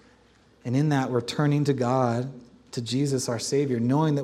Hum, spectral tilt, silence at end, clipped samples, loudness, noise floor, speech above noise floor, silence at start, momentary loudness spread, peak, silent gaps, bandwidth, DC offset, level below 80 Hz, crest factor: none; -6 dB/octave; 0 s; under 0.1%; -25 LUFS; -58 dBFS; 34 dB; 0.65 s; 10 LU; -10 dBFS; none; 13.5 kHz; under 0.1%; -64 dBFS; 16 dB